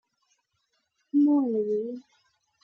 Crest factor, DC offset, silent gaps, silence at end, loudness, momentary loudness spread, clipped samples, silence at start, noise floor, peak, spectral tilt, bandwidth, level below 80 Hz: 14 dB; under 0.1%; none; 0.65 s; -25 LUFS; 14 LU; under 0.1%; 1.15 s; -76 dBFS; -14 dBFS; -10 dB/octave; 1.3 kHz; -82 dBFS